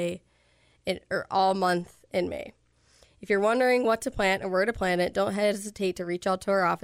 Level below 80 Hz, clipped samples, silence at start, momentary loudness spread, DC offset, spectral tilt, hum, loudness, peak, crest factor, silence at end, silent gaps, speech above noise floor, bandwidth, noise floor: -54 dBFS; under 0.1%; 0 s; 11 LU; under 0.1%; -5 dB/octave; none; -27 LUFS; -12 dBFS; 16 dB; 0.05 s; none; 38 dB; 16 kHz; -64 dBFS